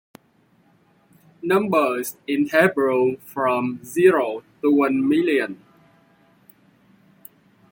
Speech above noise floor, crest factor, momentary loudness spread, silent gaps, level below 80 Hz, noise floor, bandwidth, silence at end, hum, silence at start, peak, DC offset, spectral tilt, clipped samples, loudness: 40 dB; 18 dB; 10 LU; none; -68 dBFS; -60 dBFS; 17 kHz; 2.15 s; none; 1.45 s; -4 dBFS; under 0.1%; -5.5 dB/octave; under 0.1%; -20 LUFS